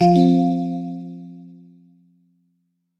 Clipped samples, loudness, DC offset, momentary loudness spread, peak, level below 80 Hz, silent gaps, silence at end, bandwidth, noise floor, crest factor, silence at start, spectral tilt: under 0.1%; -19 LUFS; under 0.1%; 25 LU; -4 dBFS; -68 dBFS; none; 1.5 s; 7.4 kHz; -70 dBFS; 18 dB; 0 s; -9 dB/octave